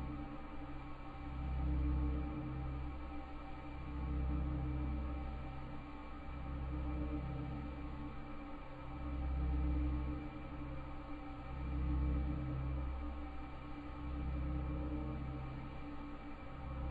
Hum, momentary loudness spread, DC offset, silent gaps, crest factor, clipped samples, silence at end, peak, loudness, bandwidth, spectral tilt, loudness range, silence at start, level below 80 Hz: none; 11 LU; under 0.1%; none; 14 dB; under 0.1%; 0 s; -26 dBFS; -44 LUFS; 4.8 kHz; -9.5 dB/octave; 3 LU; 0 s; -44 dBFS